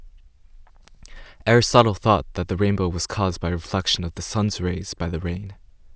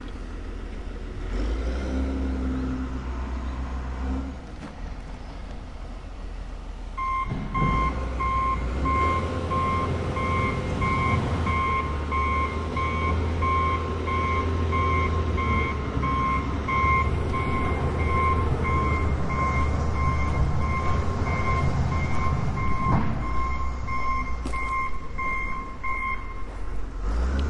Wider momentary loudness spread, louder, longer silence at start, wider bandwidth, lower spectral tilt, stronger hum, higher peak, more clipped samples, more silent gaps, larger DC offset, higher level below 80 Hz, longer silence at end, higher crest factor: second, 11 LU vs 14 LU; first, -22 LUFS vs -26 LUFS; about the same, 0 s vs 0 s; second, 8 kHz vs 10.5 kHz; second, -5 dB/octave vs -7 dB/octave; neither; first, 0 dBFS vs -10 dBFS; neither; neither; neither; second, -38 dBFS vs -32 dBFS; about the same, 0.05 s vs 0 s; first, 24 dB vs 14 dB